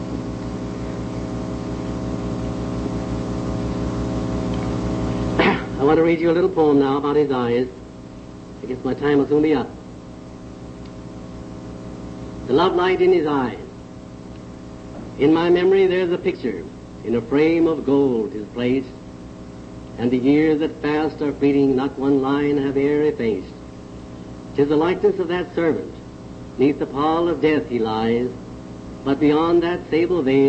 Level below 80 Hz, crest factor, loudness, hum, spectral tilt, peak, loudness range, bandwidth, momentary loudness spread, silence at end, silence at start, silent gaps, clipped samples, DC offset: -40 dBFS; 16 dB; -20 LUFS; none; -7.5 dB/octave; -4 dBFS; 6 LU; 8.6 kHz; 20 LU; 0 s; 0 s; none; under 0.1%; under 0.1%